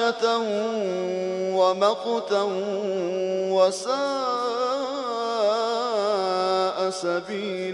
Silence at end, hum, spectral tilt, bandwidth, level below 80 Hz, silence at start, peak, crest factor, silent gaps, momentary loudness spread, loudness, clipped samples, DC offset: 0 s; none; -4 dB/octave; 11 kHz; -72 dBFS; 0 s; -8 dBFS; 16 dB; none; 6 LU; -24 LUFS; under 0.1%; under 0.1%